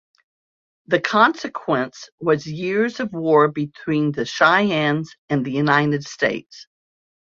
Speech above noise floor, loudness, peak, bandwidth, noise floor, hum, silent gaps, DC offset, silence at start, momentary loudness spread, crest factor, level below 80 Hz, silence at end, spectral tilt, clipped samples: over 70 dB; -20 LUFS; -2 dBFS; 7.6 kHz; under -90 dBFS; none; 2.12-2.18 s, 5.18-5.28 s; under 0.1%; 0.9 s; 9 LU; 20 dB; -62 dBFS; 0.75 s; -6 dB/octave; under 0.1%